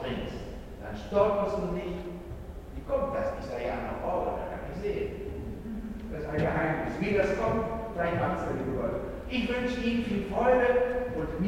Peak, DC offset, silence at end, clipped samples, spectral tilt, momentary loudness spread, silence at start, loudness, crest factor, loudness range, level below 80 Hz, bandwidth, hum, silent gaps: -10 dBFS; under 0.1%; 0 s; under 0.1%; -7 dB/octave; 13 LU; 0 s; -30 LUFS; 20 dB; 5 LU; -44 dBFS; 16 kHz; none; none